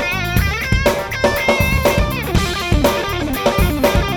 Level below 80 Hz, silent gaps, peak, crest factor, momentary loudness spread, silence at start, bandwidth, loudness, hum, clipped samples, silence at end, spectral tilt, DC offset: -22 dBFS; none; -2 dBFS; 14 dB; 3 LU; 0 s; over 20 kHz; -16 LUFS; none; under 0.1%; 0 s; -5 dB/octave; under 0.1%